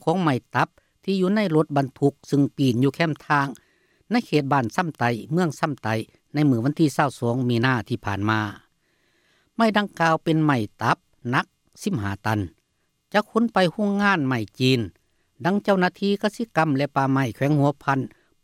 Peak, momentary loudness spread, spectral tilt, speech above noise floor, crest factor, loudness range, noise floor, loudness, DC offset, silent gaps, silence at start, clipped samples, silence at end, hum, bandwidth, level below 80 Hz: -4 dBFS; 7 LU; -6.5 dB/octave; 49 dB; 18 dB; 2 LU; -71 dBFS; -23 LUFS; under 0.1%; none; 0.05 s; under 0.1%; 0.35 s; none; 15 kHz; -62 dBFS